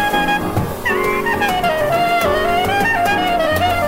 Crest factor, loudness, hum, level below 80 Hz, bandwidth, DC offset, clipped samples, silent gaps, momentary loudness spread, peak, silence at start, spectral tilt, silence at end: 12 dB; -16 LUFS; none; -36 dBFS; 16.5 kHz; under 0.1%; under 0.1%; none; 3 LU; -4 dBFS; 0 s; -4.5 dB/octave; 0 s